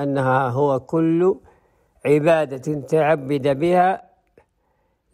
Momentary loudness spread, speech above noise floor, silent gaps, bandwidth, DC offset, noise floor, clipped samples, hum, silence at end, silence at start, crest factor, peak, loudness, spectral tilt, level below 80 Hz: 9 LU; 48 dB; none; 14.5 kHz; under 0.1%; -67 dBFS; under 0.1%; none; 1.15 s; 0 s; 14 dB; -6 dBFS; -20 LUFS; -7.5 dB/octave; -60 dBFS